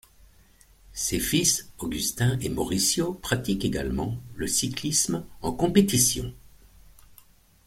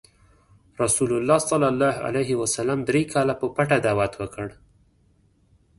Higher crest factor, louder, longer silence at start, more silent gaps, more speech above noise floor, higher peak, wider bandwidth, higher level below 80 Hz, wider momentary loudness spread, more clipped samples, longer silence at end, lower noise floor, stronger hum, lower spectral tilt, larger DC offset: about the same, 22 dB vs 18 dB; about the same, -25 LUFS vs -23 LUFS; about the same, 0.9 s vs 0.8 s; neither; second, 31 dB vs 39 dB; about the same, -6 dBFS vs -6 dBFS; first, 16.5 kHz vs 12 kHz; first, -46 dBFS vs -54 dBFS; first, 11 LU vs 7 LU; neither; about the same, 1.3 s vs 1.25 s; second, -56 dBFS vs -61 dBFS; neither; about the same, -3.5 dB/octave vs -4.5 dB/octave; neither